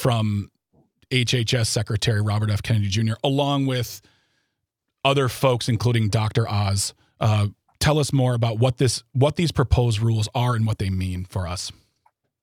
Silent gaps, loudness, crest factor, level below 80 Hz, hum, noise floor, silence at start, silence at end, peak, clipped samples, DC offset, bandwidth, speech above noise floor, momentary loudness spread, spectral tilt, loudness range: none; -22 LUFS; 18 dB; -42 dBFS; none; -80 dBFS; 0 s; 0.7 s; -4 dBFS; under 0.1%; under 0.1%; 16 kHz; 59 dB; 8 LU; -5.5 dB/octave; 2 LU